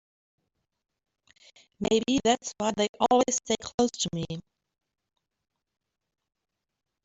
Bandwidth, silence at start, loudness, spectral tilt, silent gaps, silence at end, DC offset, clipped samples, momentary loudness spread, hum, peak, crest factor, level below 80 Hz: 8.2 kHz; 1.8 s; -27 LUFS; -3.5 dB/octave; 2.89-2.94 s, 3.74-3.78 s; 2.65 s; under 0.1%; under 0.1%; 10 LU; none; -8 dBFS; 22 dB; -60 dBFS